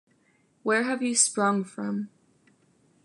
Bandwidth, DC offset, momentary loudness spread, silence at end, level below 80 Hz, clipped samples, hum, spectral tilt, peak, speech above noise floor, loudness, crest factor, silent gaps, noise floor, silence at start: 11.5 kHz; under 0.1%; 13 LU; 1 s; -82 dBFS; under 0.1%; none; -3 dB/octave; -8 dBFS; 40 dB; -25 LUFS; 22 dB; none; -66 dBFS; 0.65 s